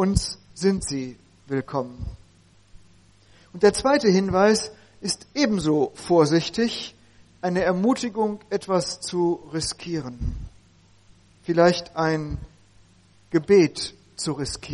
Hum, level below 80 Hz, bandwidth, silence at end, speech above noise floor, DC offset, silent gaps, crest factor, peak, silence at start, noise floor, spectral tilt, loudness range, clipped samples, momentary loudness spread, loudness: none; -42 dBFS; 11.5 kHz; 0 s; 33 dB; under 0.1%; none; 20 dB; -4 dBFS; 0 s; -56 dBFS; -5 dB/octave; 6 LU; under 0.1%; 15 LU; -23 LUFS